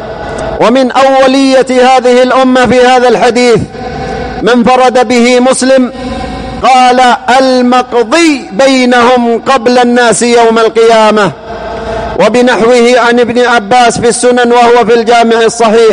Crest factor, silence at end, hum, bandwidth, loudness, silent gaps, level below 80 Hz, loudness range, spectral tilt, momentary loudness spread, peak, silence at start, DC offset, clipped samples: 6 dB; 0 s; none; 10.5 kHz; -6 LUFS; none; -34 dBFS; 2 LU; -4 dB/octave; 11 LU; 0 dBFS; 0 s; 0.2%; 0.9%